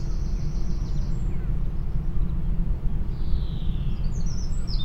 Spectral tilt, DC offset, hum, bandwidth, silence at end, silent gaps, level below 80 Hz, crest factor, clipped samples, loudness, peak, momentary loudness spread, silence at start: -7 dB/octave; under 0.1%; none; 8.2 kHz; 0 s; none; -24 dBFS; 14 dB; under 0.1%; -30 LUFS; -10 dBFS; 2 LU; 0 s